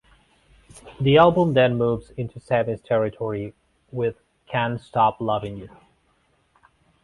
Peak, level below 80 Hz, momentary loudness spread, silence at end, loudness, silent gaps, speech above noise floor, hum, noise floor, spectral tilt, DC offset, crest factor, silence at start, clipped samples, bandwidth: -4 dBFS; -52 dBFS; 17 LU; 1.35 s; -22 LUFS; none; 43 dB; none; -65 dBFS; -7.5 dB/octave; under 0.1%; 20 dB; 0.75 s; under 0.1%; 11.5 kHz